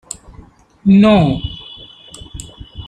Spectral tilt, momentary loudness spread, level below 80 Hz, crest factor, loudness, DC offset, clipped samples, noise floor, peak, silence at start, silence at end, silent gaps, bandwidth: -6.5 dB/octave; 26 LU; -36 dBFS; 14 dB; -12 LUFS; under 0.1%; under 0.1%; -43 dBFS; -2 dBFS; 0.85 s; 0.05 s; none; 10.5 kHz